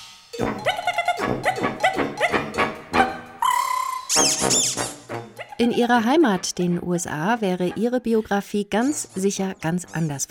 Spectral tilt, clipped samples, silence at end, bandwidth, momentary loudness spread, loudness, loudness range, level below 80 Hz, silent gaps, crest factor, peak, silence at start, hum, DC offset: -3.5 dB/octave; under 0.1%; 0.05 s; 17.5 kHz; 9 LU; -22 LUFS; 3 LU; -54 dBFS; none; 20 dB; -2 dBFS; 0 s; none; under 0.1%